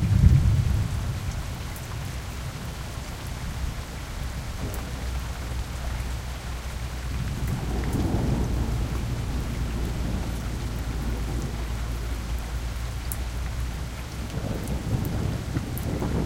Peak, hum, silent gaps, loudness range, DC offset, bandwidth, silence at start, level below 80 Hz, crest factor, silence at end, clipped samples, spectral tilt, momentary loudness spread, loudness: -4 dBFS; none; none; 5 LU; under 0.1%; 17 kHz; 0 s; -30 dBFS; 24 dB; 0 s; under 0.1%; -6 dB/octave; 8 LU; -30 LUFS